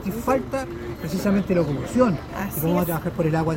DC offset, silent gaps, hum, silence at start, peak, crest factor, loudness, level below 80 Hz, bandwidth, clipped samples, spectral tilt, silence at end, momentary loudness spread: under 0.1%; none; none; 0 s; -6 dBFS; 18 dB; -23 LUFS; -42 dBFS; 16.5 kHz; under 0.1%; -7 dB/octave; 0 s; 8 LU